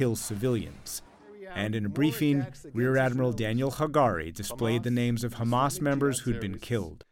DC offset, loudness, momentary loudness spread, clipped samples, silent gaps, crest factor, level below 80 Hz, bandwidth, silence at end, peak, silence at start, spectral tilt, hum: under 0.1%; -29 LUFS; 10 LU; under 0.1%; none; 16 dB; -52 dBFS; 17 kHz; 0.1 s; -12 dBFS; 0 s; -6 dB/octave; none